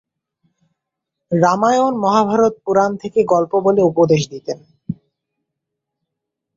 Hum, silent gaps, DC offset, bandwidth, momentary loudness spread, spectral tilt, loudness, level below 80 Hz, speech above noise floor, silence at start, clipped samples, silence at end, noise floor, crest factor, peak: none; none; under 0.1%; 7.6 kHz; 16 LU; -6.5 dB/octave; -16 LUFS; -58 dBFS; 65 dB; 1.3 s; under 0.1%; 1.65 s; -80 dBFS; 16 dB; -2 dBFS